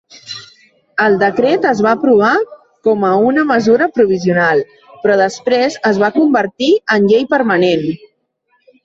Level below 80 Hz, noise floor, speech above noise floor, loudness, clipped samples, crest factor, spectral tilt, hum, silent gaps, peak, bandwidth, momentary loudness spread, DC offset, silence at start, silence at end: -56 dBFS; -62 dBFS; 50 dB; -13 LUFS; under 0.1%; 12 dB; -6 dB/octave; none; none; 0 dBFS; 7.8 kHz; 11 LU; under 0.1%; 0.25 s; 0.9 s